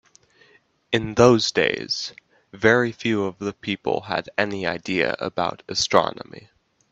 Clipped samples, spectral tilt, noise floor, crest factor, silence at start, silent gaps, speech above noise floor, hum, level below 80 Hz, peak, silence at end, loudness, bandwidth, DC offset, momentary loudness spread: under 0.1%; -4.5 dB/octave; -58 dBFS; 22 dB; 0.9 s; none; 36 dB; none; -56 dBFS; 0 dBFS; 0.55 s; -22 LUFS; 8.4 kHz; under 0.1%; 11 LU